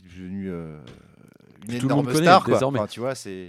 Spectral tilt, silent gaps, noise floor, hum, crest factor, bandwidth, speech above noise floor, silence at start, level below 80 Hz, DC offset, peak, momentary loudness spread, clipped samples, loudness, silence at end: -5.5 dB/octave; none; -52 dBFS; none; 22 dB; 15 kHz; 30 dB; 0.15 s; -60 dBFS; under 0.1%; 0 dBFS; 20 LU; under 0.1%; -21 LUFS; 0 s